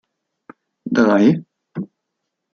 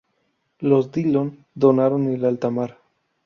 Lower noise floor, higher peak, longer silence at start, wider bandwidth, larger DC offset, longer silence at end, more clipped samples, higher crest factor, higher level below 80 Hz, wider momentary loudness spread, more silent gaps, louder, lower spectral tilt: first, -77 dBFS vs -70 dBFS; about the same, -2 dBFS vs -4 dBFS; first, 0.85 s vs 0.6 s; about the same, 6.8 kHz vs 6.6 kHz; neither; first, 0.7 s vs 0.55 s; neither; about the same, 18 dB vs 18 dB; about the same, -64 dBFS vs -64 dBFS; first, 22 LU vs 10 LU; neither; first, -16 LUFS vs -21 LUFS; second, -7.5 dB/octave vs -9.5 dB/octave